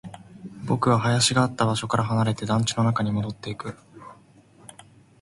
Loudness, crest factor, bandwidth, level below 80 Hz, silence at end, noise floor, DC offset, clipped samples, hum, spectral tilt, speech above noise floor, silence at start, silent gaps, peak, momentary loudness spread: -23 LUFS; 18 dB; 11.5 kHz; -54 dBFS; 1.1 s; -54 dBFS; under 0.1%; under 0.1%; none; -5 dB/octave; 31 dB; 0.05 s; none; -6 dBFS; 20 LU